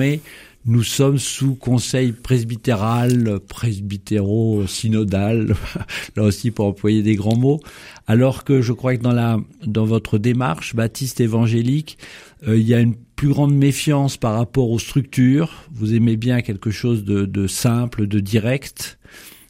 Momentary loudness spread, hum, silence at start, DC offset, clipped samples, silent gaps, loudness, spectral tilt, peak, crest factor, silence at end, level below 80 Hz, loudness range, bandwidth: 8 LU; none; 0 s; under 0.1%; under 0.1%; none; -19 LUFS; -6.5 dB/octave; -2 dBFS; 16 dB; 0.2 s; -44 dBFS; 2 LU; 16 kHz